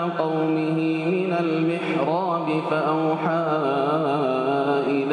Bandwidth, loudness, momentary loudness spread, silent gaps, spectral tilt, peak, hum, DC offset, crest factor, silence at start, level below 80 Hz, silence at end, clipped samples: 9.8 kHz; -23 LUFS; 1 LU; none; -8 dB/octave; -10 dBFS; none; under 0.1%; 12 dB; 0 s; -74 dBFS; 0 s; under 0.1%